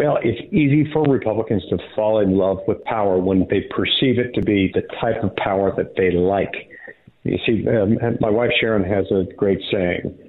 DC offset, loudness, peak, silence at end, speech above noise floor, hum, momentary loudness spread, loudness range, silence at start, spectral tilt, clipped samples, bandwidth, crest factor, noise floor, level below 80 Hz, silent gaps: under 0.1%; -19 LUFS; -6 dBFS; 0.15 s; 23 dB; none; 6 LU; 2 LU; 0 s; -10 dB/octave; under 0.1%; 4.3 kHz; 12 dB; -42 dBFS; -46 dBFS; none